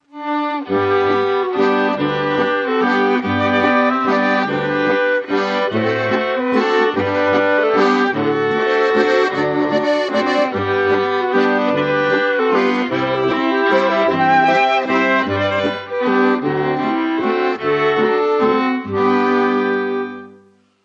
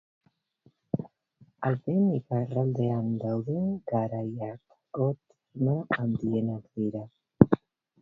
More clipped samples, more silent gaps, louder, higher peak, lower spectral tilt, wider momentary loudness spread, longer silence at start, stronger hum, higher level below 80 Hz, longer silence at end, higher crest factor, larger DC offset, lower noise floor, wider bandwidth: neither; neither; first, -16 LUFS vs -29 LUFS; about the same, -2 dBFS vs 0 dBFS; second, -6 dB/octave vs -11 dB/octave; second, 4 LU vs 15 LU; second, 0.15 s vs 0.95 s; neither; first, -52 dBFS vs -58 dBFS; about the same, 0.55 s vs 0.45 s; second, 14 dB vs 28 dB; neither; second, -50 dBFS vs -65 dBFS; first, 7.8 kHz vs 4.2 kHz